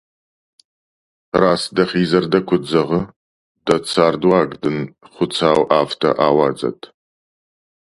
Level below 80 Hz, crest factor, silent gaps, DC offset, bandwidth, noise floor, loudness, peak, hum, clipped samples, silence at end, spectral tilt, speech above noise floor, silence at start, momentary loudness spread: -52 dBFS; 18 dB; 3.16-3.55 s; under 0.1%; 11.5 kHz; under -90 dBFS; -17 LUFS; 0 dBFS; none; under 0.1%; 1.1 s; -6 dB/octave; over 74 dB; 1.35 s; 10 LU